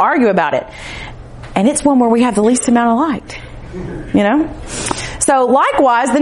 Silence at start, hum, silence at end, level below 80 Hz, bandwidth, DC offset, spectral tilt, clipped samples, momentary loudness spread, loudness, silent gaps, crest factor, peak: 0 s; none; 0 s; -36 dBFS; 11.5 kHz; under 0.1%; -4.5 dB/octave; under 0.1%; 17 LU; -13 LUFS; none; 14 dB; 0 dBFS